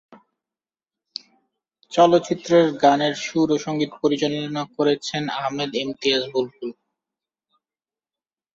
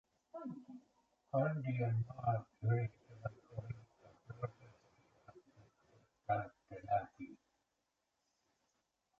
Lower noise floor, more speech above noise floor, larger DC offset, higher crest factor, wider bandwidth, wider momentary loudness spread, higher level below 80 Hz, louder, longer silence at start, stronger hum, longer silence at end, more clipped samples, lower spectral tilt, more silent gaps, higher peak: first, under -90 dBFS vs -86 dBFS; first, over 69 dB vs 48 dB; neither; about the same, 20 dB vs 20 dB; first, 7.8 kHz vs 6.4 kHz; about the same, 16 LU vs 17 LU; about the same, -66 dBFS vs -70 dBFS; first, -21 LUFS vs -41 LUFS; first, 1.9 s vs 0.35 s; neither; about the same, 1.85 s vs 1.85 s; neither; second, -5 dB/octave vs -9 dB/octave; neither; first, -2 dBFS vs -24 dBFS